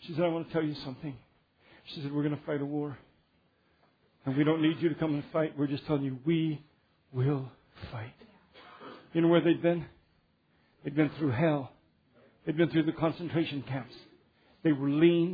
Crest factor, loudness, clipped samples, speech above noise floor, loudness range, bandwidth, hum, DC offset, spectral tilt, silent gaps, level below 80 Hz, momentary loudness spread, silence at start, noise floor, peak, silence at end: 20 dB; -30 LUFS; under 0.1%; 40 dB; 5 LU; 5 kHz; none; under 0.1%; -10 dB/octave; none; -66 dBFS; 19 LU; 0 s; -70 dBFS; -12 dBFS; 0 s